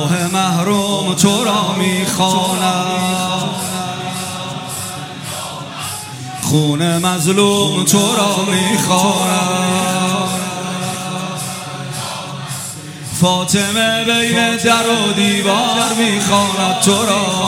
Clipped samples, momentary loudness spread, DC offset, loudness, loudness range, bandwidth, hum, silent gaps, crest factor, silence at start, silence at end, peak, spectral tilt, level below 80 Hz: under 0.1%; 12 LU; under 0.1%; -15 LUFS; 7 LU; 16.5 kHz; none; none; 16 dB; 0 s; 0 s; 0 dBFS; -3.5 dB/octave; -54 dBFS